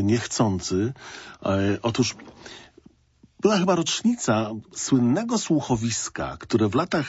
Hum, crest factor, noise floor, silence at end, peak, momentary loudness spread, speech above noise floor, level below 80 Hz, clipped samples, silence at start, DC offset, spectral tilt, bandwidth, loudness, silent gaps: none; 18 dB; -58 dBFS; 0 s; -6 dBFS; 11 LU; 35 dB; -54 dBFS; under 0.1%; 0 s; under 0.1%; -5 dB/octave; 8 kHz; -24 LUFS; none